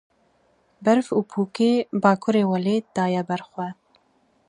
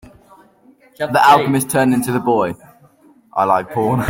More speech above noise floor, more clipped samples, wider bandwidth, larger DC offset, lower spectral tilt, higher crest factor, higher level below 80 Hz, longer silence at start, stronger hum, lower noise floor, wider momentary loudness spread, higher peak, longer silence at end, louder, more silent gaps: first, 42 dB vs 35 dB; neither; second, 10.5 kHz vs 16.5 kHz; neither; first, -7 dB/octave vs -5.5 dB/octave; first, 22 dB vs 16 dB; second, -70 dBFS vs -54 dBFS; second, 0.8 s vs 1 s; neither; first, -64 dBFS vs -50 dBFS; second, 9 LU vs 13 LU; about the same, -2 dBFS vs 0 dBFS; first, 0.75 s vs 0 s; second, -22 LUFS vs -15 LUFS; neither